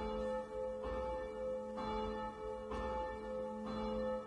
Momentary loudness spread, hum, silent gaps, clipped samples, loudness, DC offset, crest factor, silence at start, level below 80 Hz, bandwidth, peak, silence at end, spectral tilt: 3 LU; none; none; under 0.1%; -42 LUFS; under 0.1%; 12 dB; 0 s; -54 dBFS; 11 kHz; -28 dBFS; 0 s; -6.5 dB/octave